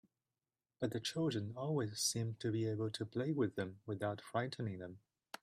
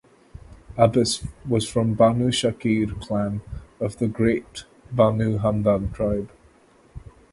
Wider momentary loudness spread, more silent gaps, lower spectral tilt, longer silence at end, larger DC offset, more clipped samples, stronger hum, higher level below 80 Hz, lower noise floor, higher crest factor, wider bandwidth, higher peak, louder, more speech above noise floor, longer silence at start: second, 8 LU vs 13 LU; neither; about the same, -5 dB/octave vs -6 dB/octave; about the same, 0.45 s vs 0.35 s; neither; neither; neither; second, -76 dBFS vs -42 dBFS; first, under -90 dBFS vs -55 dBFS; about the same, 18 dB vs 22 dB; first, 14.5 kHz vs 11.5 kHz; second, -24 dBFS vs -2 dBFS; second, -40 LUFS vs -23 LUFS; first, over 50 dB vs 33 dB; first, 0.8 s vs 0.35 s